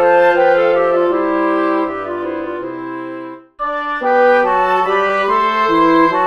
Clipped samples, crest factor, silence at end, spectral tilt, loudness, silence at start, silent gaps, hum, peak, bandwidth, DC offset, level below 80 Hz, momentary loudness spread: under 0.1%; 12 dB; 0 s; -6 dB/octave; -14 LUFS; 0 s; none; none; -2 dBFS; 7 kHz; under 0.1%; -48 dBFS; 13 LU